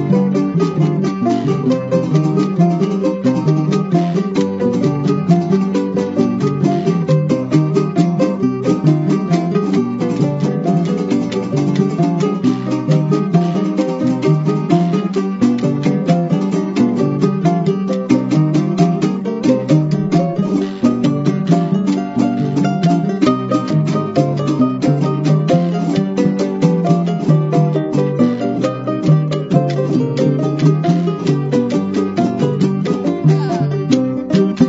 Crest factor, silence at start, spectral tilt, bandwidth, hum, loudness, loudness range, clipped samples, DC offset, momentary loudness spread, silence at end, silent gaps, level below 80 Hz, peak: 14 dB; 0 s; -8 dB/octave; 7.8 kHz; none; -15 LUFS; 1 LU; under 0.1%; under 0.1%; 3 LU; 0 s; none; -54 dBFS; 0 dBFS